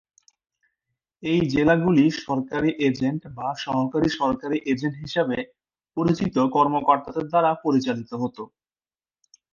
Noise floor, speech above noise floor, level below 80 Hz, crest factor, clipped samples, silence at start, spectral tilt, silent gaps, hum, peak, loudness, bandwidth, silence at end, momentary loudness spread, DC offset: under -90 dBFS; over 68 dB; -54 dBFS; 20 dB; under 0.1%; 1.2 s; -7 dB/octave; none; none; -4 dBFS; -23 LUFS; 7.2 kHz; 1.1 s; 11 LU; under 0.1%